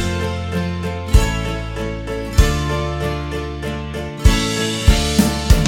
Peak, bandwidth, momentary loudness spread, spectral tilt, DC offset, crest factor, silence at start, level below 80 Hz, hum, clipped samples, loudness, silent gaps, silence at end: 0 dBFS; 17.5 kHz; 9 LU; -5 dB/octave; under 0.1%; 18 dB; 0 s; -20 dBFS; none; under 0.1%; -19 LUFS; none; 0 s